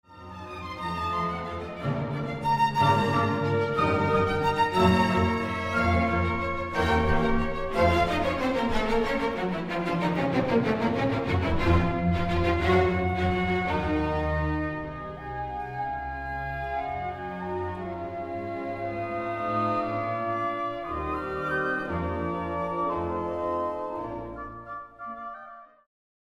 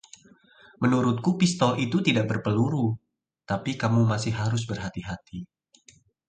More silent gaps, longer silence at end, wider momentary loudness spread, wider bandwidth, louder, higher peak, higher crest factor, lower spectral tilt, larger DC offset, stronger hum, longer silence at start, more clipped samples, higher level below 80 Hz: neither; second, 0.6 s vs 0.85 s; about the same, 12 LU vs 14 LU; first, 14.5 kHz vs 9.4 kHz; about the same, -27 LUFS vs -25 LUFS; second, -10 dBFS vs -6 dBFS; about the same, 18 dB vs 20 dB; about the same, -7 dB/octave vs -6 dB/octave; neither; neither; second, 0.1 s vs 0.8 s; neither; first, -40 dBFS vs -56 dBFS